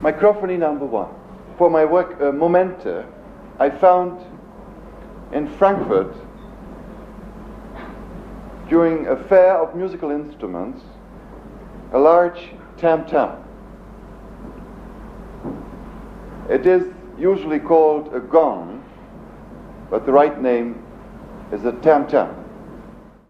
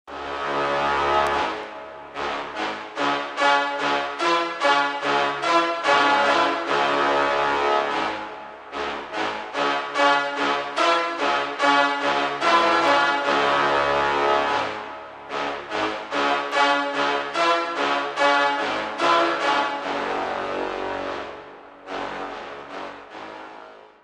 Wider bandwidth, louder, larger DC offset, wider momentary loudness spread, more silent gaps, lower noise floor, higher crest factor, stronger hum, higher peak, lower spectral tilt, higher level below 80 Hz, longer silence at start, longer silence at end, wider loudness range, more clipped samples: second, 6.4 kHz vs 10.5 kHz; first, -18 LUFS vs -22 LUFS; neither; first, 25 LU vs 15 LU; neither; about the same, -41 dBFS vs -44 dBFS; about the same, 20 dB vs 18 dB; neither; first, 0 dBFS vs -6 dBFS; first, -8.5 dB/octave vs -3 dB/octave; first, -44 dBFS vs -56 dBFS; about the same, 0 s vs 0.05 s; first, 0.3 s vs 0.15 s; about the same, 6 LU vs 5 LU; neither